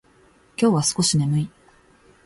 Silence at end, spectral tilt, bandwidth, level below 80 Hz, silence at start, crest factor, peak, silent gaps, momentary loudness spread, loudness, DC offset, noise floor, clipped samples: 0.75 s; -5 dB/octave; 11.5 kHz; -56 dBFS; 0.6 s; 16 dB; -6 dBFS; none; 13 LU; -20 LUFS; under 0.1%; -56 dBFS; under 0.1%